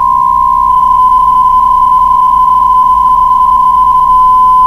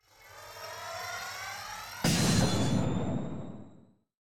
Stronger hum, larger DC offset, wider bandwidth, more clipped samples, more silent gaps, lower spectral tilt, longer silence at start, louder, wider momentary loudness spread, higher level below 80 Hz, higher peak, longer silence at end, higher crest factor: neither; neither; second, 13 kHz vs 17 kHz; neither; neither; about the same, -4.5 dB/octave vs -4.5 dB/octave; about the same, 0 s vs 0 s; first, -6 LUFS vs -31 LUFS; second, 2 LU vs 20 LU; first, -28 dBFS vs -52 dBFS; first, 0 dBFS vs -16 dBFS; about the same, 0 s vs 0.1 s; second, 6 dB vs 16 dB